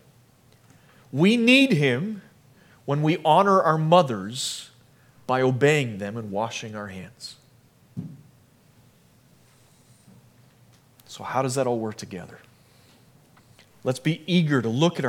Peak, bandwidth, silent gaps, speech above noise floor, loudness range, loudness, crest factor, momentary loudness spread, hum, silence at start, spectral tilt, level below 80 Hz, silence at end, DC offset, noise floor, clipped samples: -4 dBFS; 16 kHz; none; 35 dB; 15 LU; -22 LUFS; 22 dB; 22 LU; none; 1.15 s; -5.5 dB/octave; -72 dBFS; 0 s; under 0.1%; -57 dBFS; under 0.1%